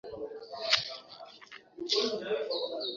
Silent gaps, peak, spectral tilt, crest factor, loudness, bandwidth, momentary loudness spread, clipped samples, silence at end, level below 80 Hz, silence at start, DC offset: none; -8 dBFS; 0.5 dB/octave; 28 dB; -32 LUFS; 7.4 kHz; 20 LU; under 0.1%; 0 s; -72 dBFS; 0.05 s; under 0.1%